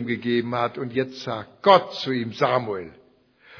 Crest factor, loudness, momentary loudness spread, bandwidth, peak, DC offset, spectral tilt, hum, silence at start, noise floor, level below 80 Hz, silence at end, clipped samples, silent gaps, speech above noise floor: 22 dB; -23 LUFS; 14 LU; 5.4 kHz; -2 dBFS; under 0.1%; -6.5 dB/octave; none; 0 s; -56 dBFS; -66 dBFS; 0 s; under 0.1%; none; 33 dB